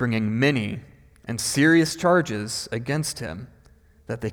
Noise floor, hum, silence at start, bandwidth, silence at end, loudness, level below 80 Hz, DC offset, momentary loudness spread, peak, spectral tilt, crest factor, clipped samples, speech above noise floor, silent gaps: -54 dBFS; none; 0 s; 20 kHz; 0 s; -23 LUFS; -54 dBFS; under 0.1%; 17 LU; -8 dBFS; -5 dB/octave; 16 dB; under 0.1%; 32 dB; none